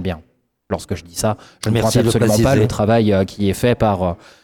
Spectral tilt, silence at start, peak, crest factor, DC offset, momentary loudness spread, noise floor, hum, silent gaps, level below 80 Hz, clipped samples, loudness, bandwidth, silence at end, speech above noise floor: -6 dB/octave; 0 s; -6 dBFS; 12 dB; under 0.1%; 12 LU; -55 dBFS; none; none; -38 dBFS; under 0.1%; -17 LUFS; 18 kHz; 0.3 s; 38 dB